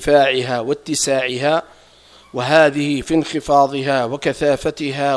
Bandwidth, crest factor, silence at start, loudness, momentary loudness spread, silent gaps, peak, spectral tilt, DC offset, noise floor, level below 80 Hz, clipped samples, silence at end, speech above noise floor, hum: 11 kHz; 18 dB; 0 s; -17 LUFS; 8 LU; none; 0 dBFS; -4 dB/octave; under 0.1%; -47 dBFS; -46 dBFS; under 0.1%; 0 s; 30 dB; none